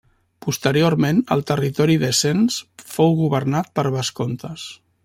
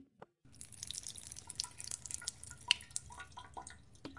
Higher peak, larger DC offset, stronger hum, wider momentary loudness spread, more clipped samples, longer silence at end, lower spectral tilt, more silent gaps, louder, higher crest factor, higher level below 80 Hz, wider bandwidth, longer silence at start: first, -4 dBFS vs -10 dBFS; neither; neither; second, 13 LU vs 20 LU; neither; first, 0.3 s vs 0 s; first, -5 dB/octave vs 0 dB/octave; neither; first, -19 LUFS vs -41 LUFS; second, 16 dB vs 34 dB; first, -56 dBFS vs -66 dBFS; first, 16.5 kHz vs 11.5 kHz; first, 0.45 s vs 0 s